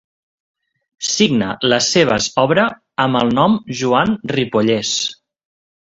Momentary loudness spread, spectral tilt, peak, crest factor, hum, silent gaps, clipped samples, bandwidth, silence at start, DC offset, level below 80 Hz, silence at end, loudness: 6 LU; -4 dB/octave; 0 dBFS; 18 dB; none; none; under 0.1%; 8 kHz; 1 s; under 0.1%; -52 dBFS; 0.85 s; -16 LUFS